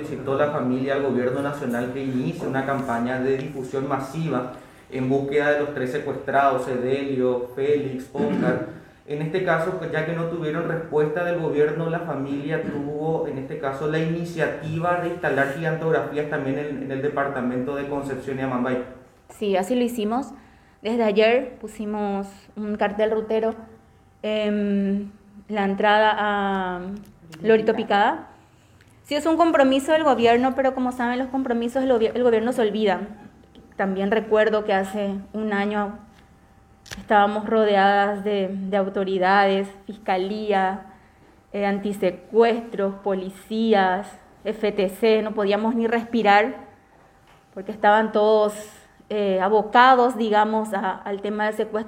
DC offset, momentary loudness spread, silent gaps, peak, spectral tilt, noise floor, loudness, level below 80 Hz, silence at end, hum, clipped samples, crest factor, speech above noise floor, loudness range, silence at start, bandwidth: under 0.1%; 11 LU; none; 0 dBFS; -6.5 dB/octave; -54 dBFS; -22 LUFS; -56 dBFS; 0 s; none; under 0.1%; 22 dB; 32 dB; 5 LU; 0 s; 16 kHz